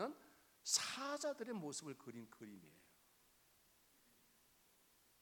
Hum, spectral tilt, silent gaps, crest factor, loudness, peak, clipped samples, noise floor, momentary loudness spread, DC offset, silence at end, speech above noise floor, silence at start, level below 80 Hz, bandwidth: none; -1.5 dB/octave; none; 26 dB; -44 LUFS; -22 dBFS; under 0.1%; -74 dBFS; 20 LU; under 0.1%; 2.4 s; 27 dB; 0 s; -90 dBFS; 19 kHz